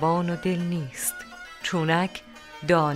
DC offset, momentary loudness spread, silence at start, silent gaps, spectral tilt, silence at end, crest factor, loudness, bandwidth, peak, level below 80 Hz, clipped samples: under 0.1%; 16 LU; 0 s; none; -5 dB/octave; 0 s; 18 dB; -26 LUFS; 16 kHz; -8 dBFS; -58 dBFS; under 0.1%